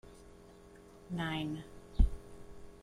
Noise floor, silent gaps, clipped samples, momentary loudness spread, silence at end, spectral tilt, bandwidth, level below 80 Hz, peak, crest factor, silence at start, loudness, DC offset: -57 dBFS; none; under 0.1%; 22 LU; 0.05 s; -6.5 dB/octave; 11.5 kHz; -38 dBFS; -14 dBFS; 24 dB; 0.05 s; -38 LUFS; under 0.1%